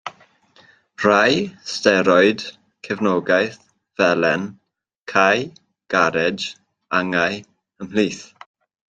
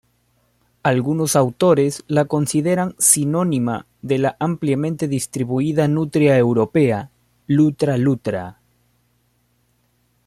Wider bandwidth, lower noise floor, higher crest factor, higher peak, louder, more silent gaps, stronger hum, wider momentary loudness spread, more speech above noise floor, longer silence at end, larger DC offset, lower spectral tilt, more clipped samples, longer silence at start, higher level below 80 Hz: second, 9.4 kHz vs 15.5 kHz; second, -53 dBFS vs -63 dBFS; about the same, 20 dB vs 20 dB; about the same, -2 dBFS vs 0 dBFS; about the same, -19 LUFS vs -18 LUFS; first, 4.97-5.04 s vs none; second, none vs 60 Hz at -45 dBFS; first, 18 LU vs 8 LU; second, 35 dB vs 46 dB; second, 0.65 s vs 1.75 s; neither; about the same, -4.5 dB/octave vs -5.5 dB/octave; neither; second, 0.05 s vs 0.85 s; about the same, -62 dBFS vs -58 dBFS